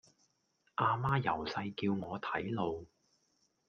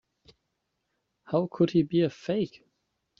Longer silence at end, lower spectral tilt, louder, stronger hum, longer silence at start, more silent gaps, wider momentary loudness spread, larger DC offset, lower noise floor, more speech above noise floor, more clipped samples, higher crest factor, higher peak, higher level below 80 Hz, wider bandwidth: about the same, 0.8 s vs 0.7 s; about the same, -7.5 dB/octave vs -7 dB/octave; second, -36 LUFS vs -28 LUFS; neither; second, 0.8 s vs 1.3 s; neither; about the same, 7 LU vs 6 LU; neither; about the same, -77 dBFS vs -80 dBFS; second, 42 dB vs 54 dB; neither; about the same, 20 dB vs 18 dB; second, -16 dBFS vs -12 dBFS; about the same, -66 dBFS vs -66 dBFS; about the same, 7 kHz vs 7 kHz